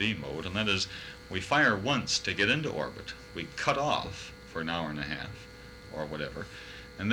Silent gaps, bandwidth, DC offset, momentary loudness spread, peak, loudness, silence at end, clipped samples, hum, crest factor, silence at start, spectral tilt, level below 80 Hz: none; 18.5 kHz; under 0.1%; 17 LU; -14 dBFS; -31 LUFS; 0 s; under 0.1%; none; 18 dB; 0 s; -3.5 dB/octave; -54 dBFS